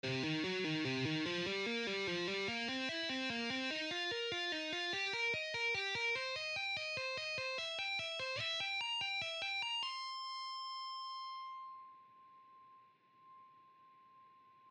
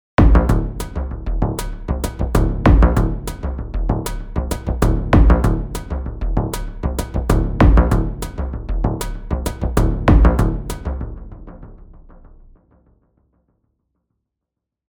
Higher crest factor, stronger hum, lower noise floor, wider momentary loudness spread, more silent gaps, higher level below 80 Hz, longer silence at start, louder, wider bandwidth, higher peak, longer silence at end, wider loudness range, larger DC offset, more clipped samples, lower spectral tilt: about the same, 14 dB vs 18 dB; neither; second, -66 dBFS vs -82 dBFS; second, 8 LU vs 13 LU; neither; second, -80 dBFS vs -20 dBFS; second, 0.05 s vs 0.2 s; second, -38 LUFS vs -19 LUFS; second, 11 kHz vs 19.5 kHz; second, -28 dBFS vs 0 dBFS; second, 0 s vs 2.6 s; first, 11 LU vs 4 LU; neither; neither; second, -3.5 dB/octave vs -7 dB/octave